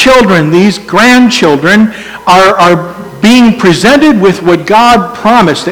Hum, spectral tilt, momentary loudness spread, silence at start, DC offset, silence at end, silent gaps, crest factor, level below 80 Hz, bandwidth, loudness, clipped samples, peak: none; -5 dB/octave; 5 LU; 0 s; 0.6%; 0 s; none; 6 dB; -36 dBFS; over 20 kHz; -5 LUFS; 9%; 0 dBFS